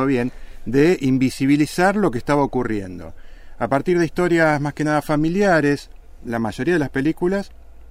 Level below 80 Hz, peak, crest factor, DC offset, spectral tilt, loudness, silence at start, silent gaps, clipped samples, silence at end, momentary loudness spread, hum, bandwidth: -40 dBFS; -4 dBFS; 16 dB; under 0.1%; -6.5 dB/octave; -19 LUFS; 0 s; none; under 0.1%; 0 s; 11 LU; none; 16 kHz